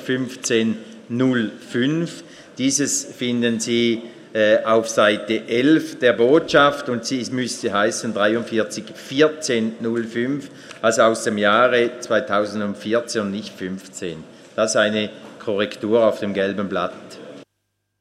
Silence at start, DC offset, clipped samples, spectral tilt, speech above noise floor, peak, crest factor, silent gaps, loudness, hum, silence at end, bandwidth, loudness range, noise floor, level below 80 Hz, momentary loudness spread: 0 s; under 0.1%; under 0.1%; -4 dB/octave; 54 dB; -2 dBFS; 18 dB; none; -20 LUFS; none; 0.55 s; 14.5 kHz; 5 LU; -74 dBFS; -64 dBFS; 14 LU